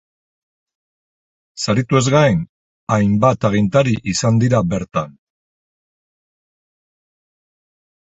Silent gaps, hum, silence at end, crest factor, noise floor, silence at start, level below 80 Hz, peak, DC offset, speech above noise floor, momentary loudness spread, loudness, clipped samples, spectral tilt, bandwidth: 2.49-2.87 s; none; 2.9 s; 18 dB; under -90 dBFS; 1.55 s; -46 dBFS; 0 dBFS; under 0.1%; over 75 dB; 10 LU; -16 LUFS; under 0.1%; -6 dB/octave; 8.2 kHz